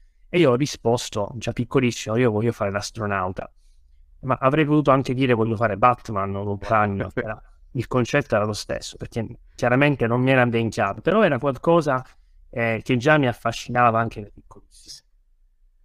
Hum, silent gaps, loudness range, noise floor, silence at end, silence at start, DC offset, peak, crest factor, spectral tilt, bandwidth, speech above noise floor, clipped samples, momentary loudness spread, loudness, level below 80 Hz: none; none; 4 LU; -58 dBFS; 0.85 s; 0.35 s; under 0.1%; -2 dBFS; 20 dB; -6 dB/octave; 14.5 kHz; 37 dB; under 0.1%; 13 LU; -22 LUFS; -48 dBFS